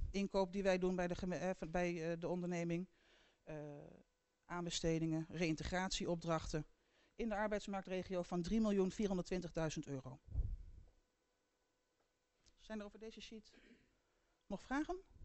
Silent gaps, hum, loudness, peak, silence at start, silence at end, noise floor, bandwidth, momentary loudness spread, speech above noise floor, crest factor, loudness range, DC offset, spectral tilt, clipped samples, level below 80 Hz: none; none; -42 LUFS; -24 dBFS; 0 s; 0 s; -84 dBFS; 8.2 kHz; 15 LU; 43 dB; 18 dB; 14 LU; under 0.1%; -5.5 dB/octave; under 0.1%; -56 dBFS